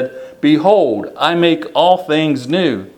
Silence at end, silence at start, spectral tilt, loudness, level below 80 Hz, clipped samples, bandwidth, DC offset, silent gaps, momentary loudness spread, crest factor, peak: 0.1 s; 0 s; -6.5 dB/octave; -14 LUFS; -62 dBFS; under 0.1%; 12 kHz; under 0.1%; none; 6 LU; 14 dB; 0 dBFS